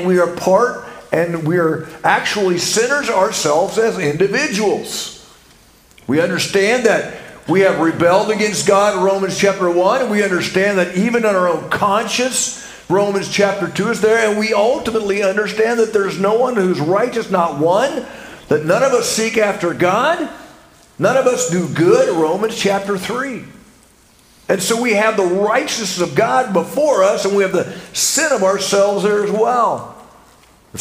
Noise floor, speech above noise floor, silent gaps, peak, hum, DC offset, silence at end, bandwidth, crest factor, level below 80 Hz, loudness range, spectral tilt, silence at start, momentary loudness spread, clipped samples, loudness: -49 dBFS; 34 dB; none; 0 dBFS; none; under 0.1%; 0 s; 16 kHz; 16 dB; -54 dBFS; 3 LU; -4 dB/octave; 0 s; 7 LU; under 0.1%; -15 LUFS